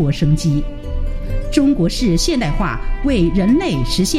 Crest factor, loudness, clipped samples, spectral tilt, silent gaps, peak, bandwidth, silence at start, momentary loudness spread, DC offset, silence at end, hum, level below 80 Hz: 14 dB; -17 LUFS; under 0.1%; -5.5 dB/octave; none; 0 dBFS; 15.5 kHz; 0 s; 11 LU; under 0.1%; 0 s; none; -22 dBFS